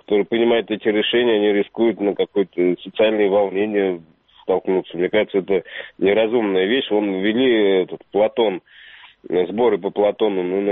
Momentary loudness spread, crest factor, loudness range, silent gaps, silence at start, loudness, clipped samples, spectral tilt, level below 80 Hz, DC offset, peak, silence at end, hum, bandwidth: 6 LU; 14 dB; 2 LU; none; 0.1 s; -19 LUFS; under 0.1%; -3.5 dB/octave; -62 dBFS; under 0.1%; -4 dBFS; 0 s; none; 4 kHz